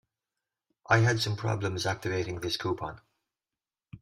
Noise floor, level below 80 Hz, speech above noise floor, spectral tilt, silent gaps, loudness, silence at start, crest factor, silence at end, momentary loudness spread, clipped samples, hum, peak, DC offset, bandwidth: under -90 dBFS; -60 dBFS; over 61 dB; -5 dB/octave; none; -29 LUFS; 0.9 s; 22 dB; 0.05 s; 9 LU; under 0.1%; none; -10 dBFS; under 0.1%; 14 kHz